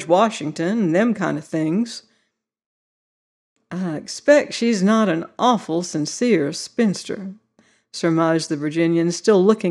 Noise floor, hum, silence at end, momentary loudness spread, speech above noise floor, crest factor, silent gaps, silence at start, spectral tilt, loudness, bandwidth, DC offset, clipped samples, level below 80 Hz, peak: -71 dBFS; none; 0 s; 12 LU; 52 dB; 16 dB; 2.66-3.56 s; 0 s; -5.5 dB/octave; -20 LUFS; 11.5 kHz; under 0.1%; under 0.1%; -72 dBFS; -4 dBFS